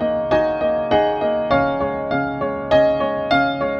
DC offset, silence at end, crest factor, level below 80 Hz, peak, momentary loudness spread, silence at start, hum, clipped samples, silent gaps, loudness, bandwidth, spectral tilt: under 0.1%; 0 s; 14 dB; -42 dBFS; -4 dBFS; 6 LU; 0 s; none; under 0.1%; none; -19 LUFS; 6.6 kHz; -7 dB/octave